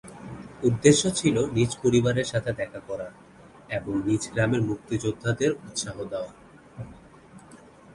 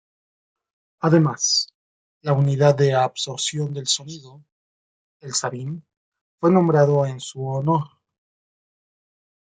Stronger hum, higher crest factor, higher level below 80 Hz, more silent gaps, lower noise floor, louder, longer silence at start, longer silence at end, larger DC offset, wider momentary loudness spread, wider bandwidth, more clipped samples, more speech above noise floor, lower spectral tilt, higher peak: neither; about the same, 22 dB vs 20 dB; first, -52 dBFS vs -66 dBFS; second, none vs 1.75-2.21 s, 4.52-5.20 s, 5.97-6.12 s, 6.21-6.38 s; second, -50 dBFS vs under -90 dBFS; second, -25 LUFS vs -20 LUFS; second, 0.05 s vs 1.05 s; second, 0.4 s vs 1.6 s; neither; first, 20 LU vs 15 LU; first, 11.5 kHz vs 9.4 kHz; neither; second, 25 dB vs over 70 dB; about the same, -5 dB/octave vs -5 dB/octave; about the same, -4 dBFS vs -4 dBFS